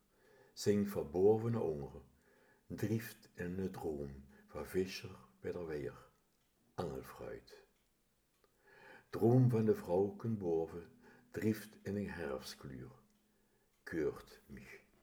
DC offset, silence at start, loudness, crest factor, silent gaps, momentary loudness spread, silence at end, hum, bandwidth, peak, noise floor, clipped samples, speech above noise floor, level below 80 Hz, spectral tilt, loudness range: under 0.1%; 0.55 s; -38 LUFS; 20 dB; none; 22 LU; 0.25 s; none; over 20 kHz; -20 dBFS; -78 dBFS; under 0.1%; 40 dB; -66 dBFS; -7.5 dB/octave; 12 LU